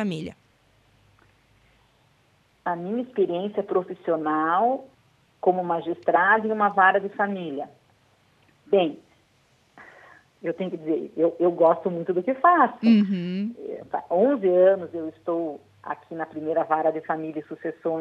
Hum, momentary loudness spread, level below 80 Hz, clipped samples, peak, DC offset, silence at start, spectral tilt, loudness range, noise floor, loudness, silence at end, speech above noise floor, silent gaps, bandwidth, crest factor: none; 15 LU; -72 dBFS; under 0.1%; -4 dBFS; under 0.1%; 0 s; -8 dB/octave; 9 LU; -63 dBFS; -24 LUFS; 0 s; 39 dB; none; 7.6 kHz; 20 dB